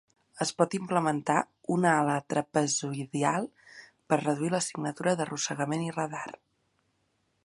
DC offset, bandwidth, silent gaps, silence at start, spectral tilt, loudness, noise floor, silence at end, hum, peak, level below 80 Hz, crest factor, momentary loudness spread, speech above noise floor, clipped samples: under 0.1%; 11.5 kHz; none; 0.35 s; -4.5 dB/octave; -29 LUFS; -74 dBFS; 1.15 s; none; -8 dBFS; -76 dBFS; 22 dB; 7 LU; 46 dB; under 0.1%